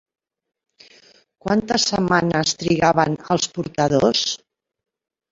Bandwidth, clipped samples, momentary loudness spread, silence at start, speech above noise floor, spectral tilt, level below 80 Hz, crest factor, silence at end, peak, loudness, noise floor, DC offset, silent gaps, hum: 8 kHz; under 0.1%; 7 LU; 1.45 s; 34 dB; -4 dB/octave; -52 dBFS; 20 dB; 0.95 s; -2 dBFS; -19 LUFS; -53 dBFS; under 0.1%; none; none